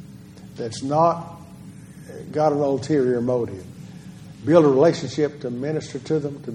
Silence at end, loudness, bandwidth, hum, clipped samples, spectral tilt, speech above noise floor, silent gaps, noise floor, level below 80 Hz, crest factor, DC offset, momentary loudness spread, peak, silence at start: 0 s; -21 LUFS; 12 kHz; none; under 0.1%; -7 dB/octave; 21 dB; none; -42 dBFS; -60 dBFS; 20 dB; under 0.1%; 25 LU; -2 dBFS; 0 s